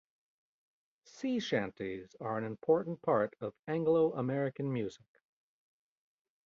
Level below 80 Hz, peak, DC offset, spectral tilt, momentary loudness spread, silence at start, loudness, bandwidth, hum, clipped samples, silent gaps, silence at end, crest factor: -74 dBFS; -16 dBFS; under 0.1%; -5.5 dB/octave; 12 LU; 1.15 s; -34 LUFS; 7.4 kHz; none; under 0.1%; 3.59-3.63 s; 1.5 s; 20 dB